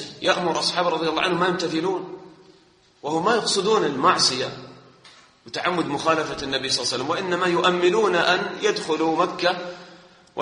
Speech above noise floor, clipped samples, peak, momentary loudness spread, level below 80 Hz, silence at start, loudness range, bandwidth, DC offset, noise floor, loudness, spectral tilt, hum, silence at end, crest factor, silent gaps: 34 dB; under 0.1%; -4 dBFS; 12 LU; -60 dBFS; 0 s; 3 LU; 10.5 kHz; under 0.1%; -56 dBFS; -22 LUFS; -3.5 dB/octave; none; 0 s; 20 dB; none